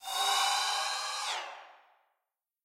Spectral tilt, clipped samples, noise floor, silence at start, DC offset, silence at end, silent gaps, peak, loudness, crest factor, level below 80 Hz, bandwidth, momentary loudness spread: 4 dB/octave; under 0.1%; -87 dBFS; 0 s; under 0.1%; 0.9 s; none; -18 dBFS; -30 LUFS; 18 dB; -82 dBFS; 16 kHz; 14 LU